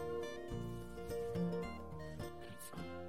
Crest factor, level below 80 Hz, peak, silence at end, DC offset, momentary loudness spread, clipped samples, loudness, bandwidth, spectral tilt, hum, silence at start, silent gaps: 14 dB; -58 dBFS; -30 dBFS; 0 s; 0.2%; 9 LU; under 0.1%; -45 LUFS; 16 kHz; -6.5 dB/octave; none; 0 s; none